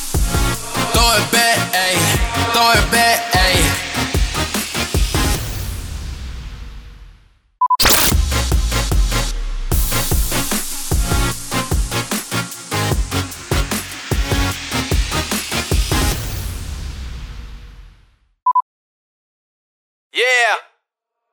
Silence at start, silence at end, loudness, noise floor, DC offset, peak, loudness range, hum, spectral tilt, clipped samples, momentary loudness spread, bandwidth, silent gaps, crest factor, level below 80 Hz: 0 s; 0.7 s; -17 LUFS; -78 dBFS; under 0.1%; -2 dBFS; 9 LU; none; -3 dB/octave; under 0.1%; 16 LU; over 20 kHz; 18.62-20.10 s; 16 dB; -24 dBFS